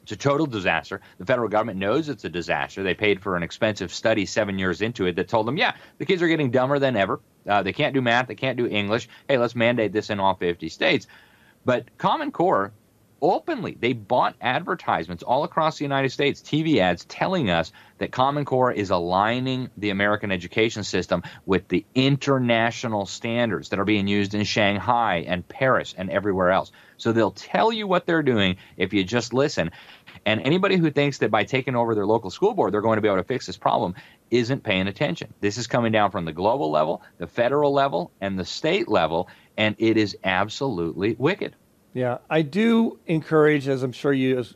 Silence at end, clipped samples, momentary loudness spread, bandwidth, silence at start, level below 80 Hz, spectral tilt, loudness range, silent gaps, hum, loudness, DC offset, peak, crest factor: 0.05 s; under 0.1%; 7 LU; 13.5 kHz; 0.1 s; -58 dBFS; -5.5 dB/octave; 2 LU; none; none; -23 LUFS; under 0.1%; -4 dBFS; 18 dB